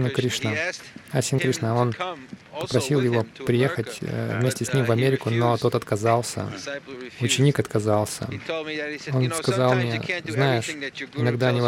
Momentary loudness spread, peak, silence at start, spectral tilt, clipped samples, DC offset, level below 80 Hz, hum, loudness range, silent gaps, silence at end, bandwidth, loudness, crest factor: 10 LU; -6 dBFS; 0 s; -5.5 dB/octave; under 0.1%; under 0.1%; -60 dBFS; none; 2 LU; none; 0 s; 16 kHz; -24 LUFS; 18 dB